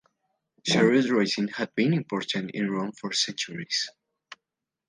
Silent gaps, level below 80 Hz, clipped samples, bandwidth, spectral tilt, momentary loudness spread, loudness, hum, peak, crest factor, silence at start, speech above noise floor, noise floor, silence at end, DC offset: none; -72 dBFS; under 0.1%; 10 kHz; -4.5 dB/octave; 10 LU; -26 LUFS; none; -8 dBFS; 18 dB; 0.65 s; 61 dB; -87 dBFS; 0.55 s; under 0.1%